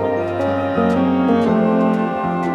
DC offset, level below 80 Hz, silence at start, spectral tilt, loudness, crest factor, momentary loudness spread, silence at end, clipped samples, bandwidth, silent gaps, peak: under 0.1%; -56 dBFS; 0 s; -8.5 dB/octave; -17 LUFS; 12 dB; 5 LU; 0 s; under 0.1%; 8.4 kHz; none; -4 dBFS